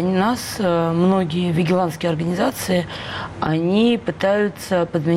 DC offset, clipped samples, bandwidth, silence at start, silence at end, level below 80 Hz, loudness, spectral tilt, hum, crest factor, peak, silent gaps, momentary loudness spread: under 0.1%; under 0.1%; 16 kHz; 0 s; 0 s; -50 dBFS; -20 LUFS; -6 dB/octave; none; 12 dB; -8 dBFS; none; 5 LU